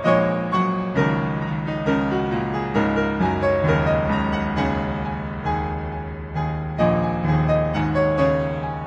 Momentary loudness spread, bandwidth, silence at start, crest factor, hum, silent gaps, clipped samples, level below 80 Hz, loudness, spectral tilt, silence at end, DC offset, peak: 8 LU; 7.6 kHz; 0 s; 16 dB; none; none; under 0.1%; -36 dBFS; -22 LUFS; -8.5 dB/octave; 0 s; under 0.1%; -4 dBFS